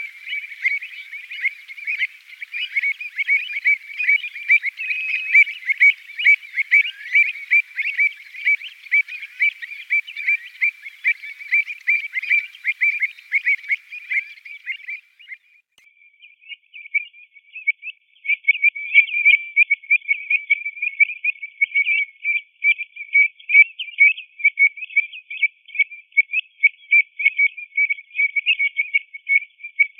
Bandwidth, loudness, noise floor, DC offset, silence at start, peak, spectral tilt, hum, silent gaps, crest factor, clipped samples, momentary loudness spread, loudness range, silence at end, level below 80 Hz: 10 kHz; -18 LUFS; -56 dBFS; under 0.1%; 0 s; 0 dBFS; 8.5 dB/octave; none; none; 20 dB; under 0.1%; 13 LU; 9 LU; 0.15 s; under -90 dBFS